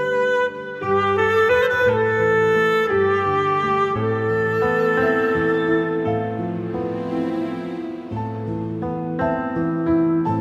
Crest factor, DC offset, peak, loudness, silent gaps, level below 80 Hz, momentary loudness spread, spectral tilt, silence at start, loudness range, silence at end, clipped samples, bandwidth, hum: 12 dB; under 0.1%; -8 dBFS; -20 LUFS; none; -50 dBFS; 10 LU; -7 dB/octave; 0 s; 7 LU; 0 s; under 0.1%; 13 kHz; none